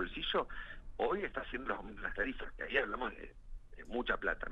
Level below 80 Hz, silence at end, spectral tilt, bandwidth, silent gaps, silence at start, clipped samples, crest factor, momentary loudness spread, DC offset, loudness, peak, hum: -50 dBFS; 0 s; -6 dB/octave; 7.4 kHz; none; 0 s; under 0.1%; 20 dB; 13 LU; under 0.1%; -38 LUFS; -18 dBFS; none